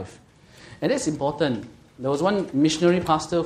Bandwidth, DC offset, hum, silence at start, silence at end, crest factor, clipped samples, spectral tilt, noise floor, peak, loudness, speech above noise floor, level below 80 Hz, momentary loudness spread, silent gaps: 12.5 kHz; under 0.1%; none; 0 s; 0 s; 18 dB; under 0.1%; -5.5 dB/octave; -50 dBFS; -6 dBFS; -23 LUFS; 28 dB; -54 dBFS; 12 LU; none